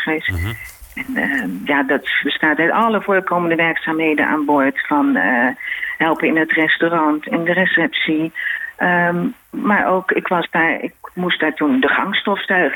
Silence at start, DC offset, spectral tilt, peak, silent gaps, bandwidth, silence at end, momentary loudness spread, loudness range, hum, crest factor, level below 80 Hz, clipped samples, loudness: 0 s; under 0.1%; -6 dB/octave; -4 dBFS; none; 19 kHz; 0 s; 8 LU; 2 LU; none; 14 dB; -48 dBFS; under 0.1%; -17 LUFS